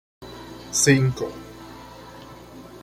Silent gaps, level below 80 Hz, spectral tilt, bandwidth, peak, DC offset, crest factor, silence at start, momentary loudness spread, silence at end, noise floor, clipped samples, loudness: none; -52 dBFS; -4 dB/octave; 16 kHz; -6 dBFS; under 0.1%; 20 dB; 0.2 s; 25 LU; 0.05 s; -42 dBFS; under 0.1%; -21 LUFS